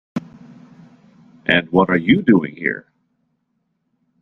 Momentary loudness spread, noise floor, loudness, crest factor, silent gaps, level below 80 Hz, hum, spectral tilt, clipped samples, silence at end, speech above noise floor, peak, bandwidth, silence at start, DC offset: 16 LU; -70 dBFS; -17 LUFS; 20 dB; none; -56 dBFS; none; -8 dB/octave; under 0.1%; 1.4 s; 54 dB; -2 dBFS; 6.6 kHz; 0.15 s; under 0.1%